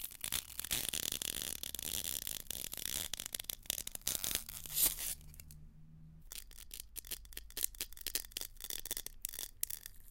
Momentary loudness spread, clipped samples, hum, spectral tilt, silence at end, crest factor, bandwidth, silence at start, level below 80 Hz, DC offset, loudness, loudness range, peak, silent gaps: 14 LU; under 0.1%; none; 0 dB/octave; 0 s; 32 dB; 17 kHz; 0 s; -56 dBFS; under 0.1%; -39 LUFS; 6 LU; -10 dBFS; none